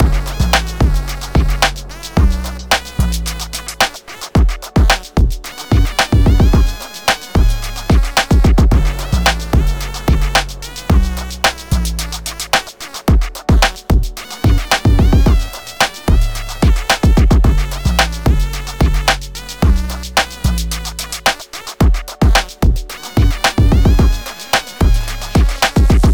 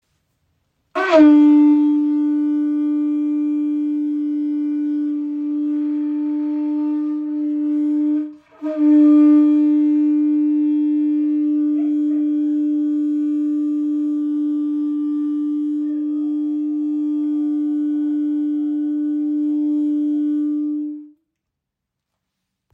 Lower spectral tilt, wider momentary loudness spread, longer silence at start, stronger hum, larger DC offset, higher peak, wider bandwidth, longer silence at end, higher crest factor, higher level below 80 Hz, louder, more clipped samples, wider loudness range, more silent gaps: second, -4.5 dB/octave vs -6.5 dB/octave; about the same, 9 LU vs 10 LU; second, 0 s vs 0.95 s; neither; first, 0.5% vs under 0.1%; about the same, -2 dBFS vs -2 dBFS; first, over 20 kHz vs 4.7 kHz; second, 0 s vs 1.65 s; about the same, 12 dB vs 16 dB; first, -16 dBFS vs -74 dBFS; first, -15 LUFS vs -18 LUFS; neither; second, 3 LU vs 6 LU; neither